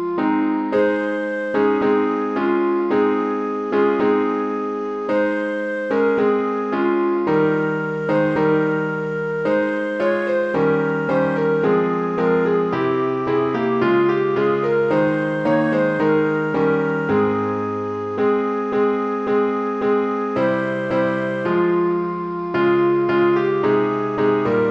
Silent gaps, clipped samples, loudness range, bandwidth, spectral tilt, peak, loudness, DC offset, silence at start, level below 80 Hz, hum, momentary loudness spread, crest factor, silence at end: none; under 0.1%; 2 LU; 7.4 kHz; -8.5 dB/octave; -6 dBFS; -19 LUFS; under 0.1%; 0 s; -60 dBFS; none; 5 LU; 12 dB; 0 s